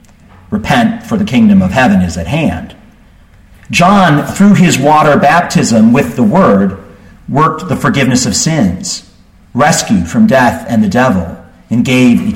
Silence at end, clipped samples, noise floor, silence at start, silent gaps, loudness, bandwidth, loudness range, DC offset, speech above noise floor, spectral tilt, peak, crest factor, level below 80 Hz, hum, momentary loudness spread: 0 s; under 0.1%; -41 dBFS; 0.5 s; none; -9 LUFS; 16 kHz; 4 LU; under 0.1%; 32 dB; -5.5 dB/octave; 0 dBFS; 10 dB; -36 dBFS; none; 10 LU